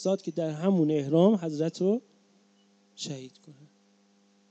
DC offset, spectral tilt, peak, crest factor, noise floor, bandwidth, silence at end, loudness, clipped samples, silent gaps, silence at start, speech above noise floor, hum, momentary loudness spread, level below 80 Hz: under 0.1%; -7 dB/octave; -10 dBFS; 20 dB; -64 dBFS; 8.4 kHz; 1 s; -27 LUFS; under 0.1%; none; 0 s; 37 dB; none; 16 LU; -80 dBFS